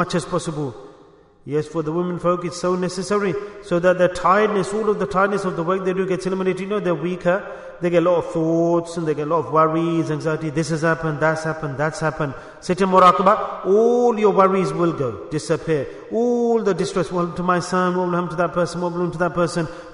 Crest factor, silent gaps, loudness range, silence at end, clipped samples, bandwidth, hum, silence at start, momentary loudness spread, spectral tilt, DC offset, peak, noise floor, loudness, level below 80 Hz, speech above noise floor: 18 dB; none; 5 LU; 0 s; under 0.1%; 11 kHz; none; 0 s; 8 LU; -6.5 dB/octave; under 0.1%; -2 dBFS; -49 dBFS; -20 LUFS; -50 dBFS; 30 dB